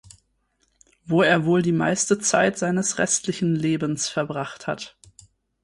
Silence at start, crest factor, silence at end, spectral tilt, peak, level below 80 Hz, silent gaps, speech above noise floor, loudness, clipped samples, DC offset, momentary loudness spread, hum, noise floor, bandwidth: 1.05 s; 18 dB; 0.75 s; -4 dB/octave; -6 dBFS; -60 dBFS; none; 47 dB; -22 LUFS; under 0.1%; under 0.1%; 11 LU; none; -69 dBFS; 11.5 kHz